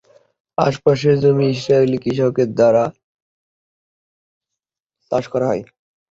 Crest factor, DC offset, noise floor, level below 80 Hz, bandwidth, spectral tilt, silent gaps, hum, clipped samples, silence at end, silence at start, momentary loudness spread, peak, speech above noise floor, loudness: 18 dB; under 0.1%; -84 dBFS; -56 dBFS; 7.8 kHz; -7.5 dB/octave; 3.04-4.41 s; none; under 0.1%; 0.45 s; 0.6 s; 9 LU; -2 dBFS; 69 dB; -17 LUFS